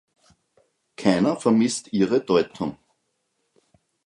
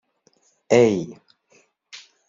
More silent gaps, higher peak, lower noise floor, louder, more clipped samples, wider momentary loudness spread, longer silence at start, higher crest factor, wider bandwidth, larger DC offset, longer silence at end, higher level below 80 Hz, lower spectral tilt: neither; about the same, -4 dBFS vs -4 dBFS; first, -74 dBFS vs -63 dBFS; second, -22 LUFS vs -19 LUFS; neither; second, 9 LU vs 26 LU; first, 1 s vs 0.7 s; about the same, 22 dB vs 20 dB; first, 11.5 kHz vs 7.6 kHz; neither; first, 1.3 s vs 0.3 s; about the same, -62 dBFS vs -64 dBFS; about the same, -5.5 dB/octave vs -6 dB/octave